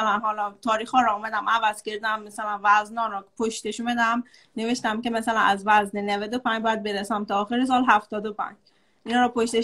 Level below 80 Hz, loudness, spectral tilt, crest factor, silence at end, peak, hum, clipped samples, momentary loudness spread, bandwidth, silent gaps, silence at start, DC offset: -62 dBFS; -24 LUFS; -3.5 dB/octave; 20 dB; 0 s; -4 dBFS; none; under 0.1%; 9 LU; 12.5 kHz; none; 0 s; under 0.1%